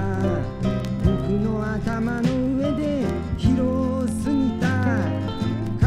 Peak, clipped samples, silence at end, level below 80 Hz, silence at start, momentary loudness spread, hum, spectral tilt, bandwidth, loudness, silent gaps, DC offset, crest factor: -6 dBFS; under 0.1%; 0 s; -34 dBFS; 0 s; 4 LU; none; -7.5 dB/octave; 13 kHz; -23 LUFS; none; under 0.1%; 16 dB